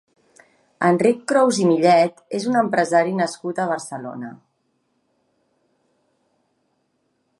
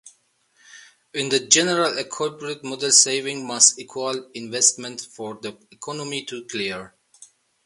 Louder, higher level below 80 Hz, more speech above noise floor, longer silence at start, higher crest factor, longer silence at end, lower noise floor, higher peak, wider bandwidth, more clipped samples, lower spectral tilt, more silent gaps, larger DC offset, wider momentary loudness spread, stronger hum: about the same, -19 LUFS vs -20 LUFS; about the same, -72 dBFS vs -70 dBFS; first, 51 dB vs 40 dB; first, 0.8 s vs 0.05 s; second, 18 dB vs 24 dB; first, 3.05 s vs 0.4 s; first, -69 dBFS vs -63 dBFS; about the same, -2 dBFS vs 0 dBFS; about the same, 11.5 kHz vs 11.5 kHz; neither; first, -5.5 dB/octave vs -1 dB/octave; neither; neither; about the same, 16 LU vs 18 LU; neither